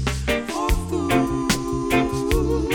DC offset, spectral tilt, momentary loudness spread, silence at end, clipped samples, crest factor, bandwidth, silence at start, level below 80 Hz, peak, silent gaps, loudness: under 0.1%; -5 dB/octave; 3 LU; 0 s; under 0.1%; 14 dB; 19.5 kHz; 0 s; -28 dBFS; -8 dBFS; none; -22 LUFS